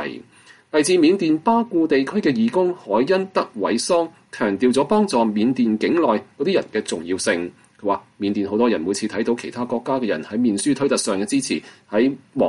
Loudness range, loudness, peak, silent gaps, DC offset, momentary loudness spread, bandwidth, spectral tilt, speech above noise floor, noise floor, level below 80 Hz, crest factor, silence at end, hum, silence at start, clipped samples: 4 LU; -20 LUFS; -6 dBFS; none; under 0.1%; 7 LU; 11.5 kHz; -4.5 dB/octave; 30 dB; -50 dBFS; -62 dBFS; 14 dB; 0 s; none; 0 s; under 0.1%